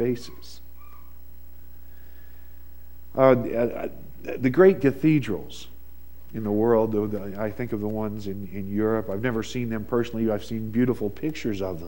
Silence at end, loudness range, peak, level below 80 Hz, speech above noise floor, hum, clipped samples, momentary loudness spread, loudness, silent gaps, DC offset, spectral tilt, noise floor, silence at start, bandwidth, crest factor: 0 s; 5 LU; -2 dBFS; -48 dBFS; 24 dB; none; under 0.1%; 17 LU; -25 LUFS; none; 1%; -7.5 dB/octave; -48 dBFS; 0 s; 16.5 kHz; 22 dB